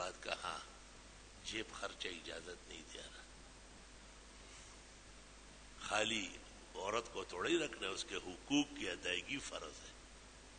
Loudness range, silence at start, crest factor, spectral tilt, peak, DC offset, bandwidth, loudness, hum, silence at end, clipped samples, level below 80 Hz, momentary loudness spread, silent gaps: 13 LU; 0 s; 24 dB; -2.5 dB/octave; -20 dBFS; under 0.1%; 9.4 kHz; -42 LUFS; none; 0 s; under 0.1%; -64 dBFS; 20 LU; none